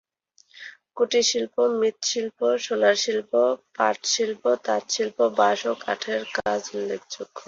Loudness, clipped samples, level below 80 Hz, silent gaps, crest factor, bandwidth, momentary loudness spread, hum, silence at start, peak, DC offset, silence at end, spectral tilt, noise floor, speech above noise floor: -24 LUFS; under 0.1%; -70 dBFS; none; 18 dB; 7.8 kHz; 10 LU; none; 0.55 s; -6 dBFS; under 0.1%; 0.05 s; -1.5 dB/octave; -61 dBFS; 38 dB